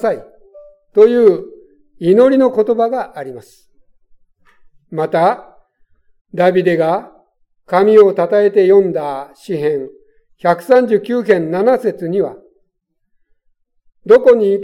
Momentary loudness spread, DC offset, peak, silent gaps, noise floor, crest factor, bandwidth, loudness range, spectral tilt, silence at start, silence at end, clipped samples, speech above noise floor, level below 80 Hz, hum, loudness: 16 LU; under 0.1%; 0 dBFS; 6.21-6.25 s; -68 dBFS; 14 dB; 11.5 kHz; 6 LU; -7.5 dB/octave; 0 s; 0 s; under 0.1%; 55 dB; -58 dBFS; none; -13 LUFS